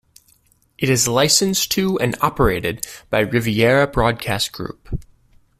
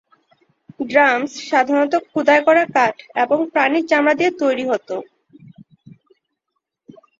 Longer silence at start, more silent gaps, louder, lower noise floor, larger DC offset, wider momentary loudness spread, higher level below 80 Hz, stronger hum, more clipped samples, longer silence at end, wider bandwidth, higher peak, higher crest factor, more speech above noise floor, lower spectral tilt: about the same, 0.8 s vs 0.8 s; neither; about the same, -18 LUFS vs -17 LUFS; second, -58 dBFS vs -77 dBFS; neither; first, 15 LU vs 8 LU; first, -36 dBFS vs -68 dBFS; neither; neither; second, 0.55 s vs 1.6 s; first, 16 kHz vs 7.8 kHz; about the same, 0 dBFS vs -2 dBFS; about the same, 18 dB vs 18 dB; second, 40 dB vs 60 dB; about the same, -3.5 dB/octave vs -4.5 dB/octave